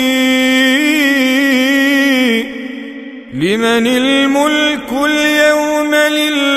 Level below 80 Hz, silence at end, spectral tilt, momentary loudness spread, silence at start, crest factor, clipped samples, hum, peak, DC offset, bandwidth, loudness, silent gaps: -50 dBFS; 0 s; -3 dB/octave; 12 LU; 0 s; 12 dB; under 0.1%; none; 0 dBFS; under 0.1%; 16 kHz; -11 LUFS; none